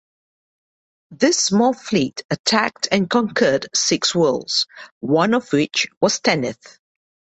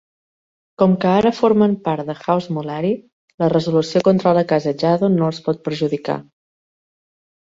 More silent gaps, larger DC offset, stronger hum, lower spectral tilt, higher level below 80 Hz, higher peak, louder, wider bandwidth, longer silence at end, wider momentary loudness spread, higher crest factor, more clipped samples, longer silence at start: about the same, 2.24-2.29 s, 2.39-2.44 s, 4.91-5.01 s, 5.97-6.01 s vs 3.12-3.28 s, 3.34-3.38 s; neither; neither; second, -3.5 dB/octave vs -7.5 dB/octave; about the same, -60 dBFS vs -58 dBFS; about the same, -2 dBFS vs -2 dBFS; about the same, -18 LUFS vs -18 LUFS; first, 8.4 kHz vs 7.6 kHz; second, 0.75 s vs 1.3 s; second, 5 LU vs 8 LU; about the same, 18 dB vs 16 dB; neither; first, 1.1 s vs 0.8 s